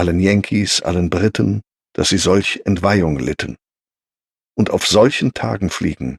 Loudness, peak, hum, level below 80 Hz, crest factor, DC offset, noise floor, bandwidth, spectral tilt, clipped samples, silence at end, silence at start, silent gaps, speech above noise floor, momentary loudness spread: -16 LUFS; -2 dBFS; none; -38 dBFS; 16 dB; under 0.1%; under -90 dBFS; 13.5 kHz; -5 dB/octave; under 0.1%; 0 s; 0 s; none; over 74 dB; 9 LU